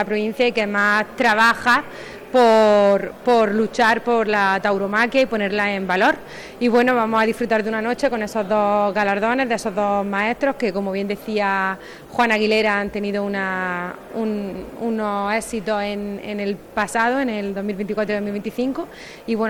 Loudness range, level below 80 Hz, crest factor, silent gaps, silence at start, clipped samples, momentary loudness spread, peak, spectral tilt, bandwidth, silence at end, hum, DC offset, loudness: 7 LU; -52 dBFS; 14 dB; none; 0 s; under 0.1%; 10 LU; -6 dBFS; -5 dB/octave; 19.5 kHz; 0 s; none; under 0.1%; -20 LUFS